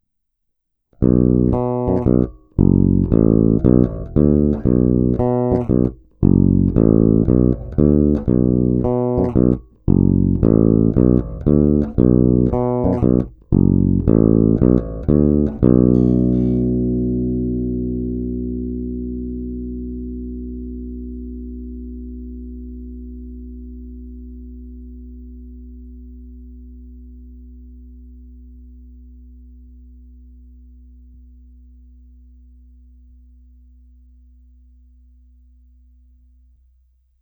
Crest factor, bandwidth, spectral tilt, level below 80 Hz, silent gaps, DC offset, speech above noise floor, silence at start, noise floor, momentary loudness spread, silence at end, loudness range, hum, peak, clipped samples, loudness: 18 dB; 2.6 kHz; -14 dB/octave; -30 dBFS; none; under 0.1%; 58 dB; 1 s; -72 dBFS; 21 LU; 8.1 s; 20 LU; none; 0 dBFS; under 0.1%; -16 LUFS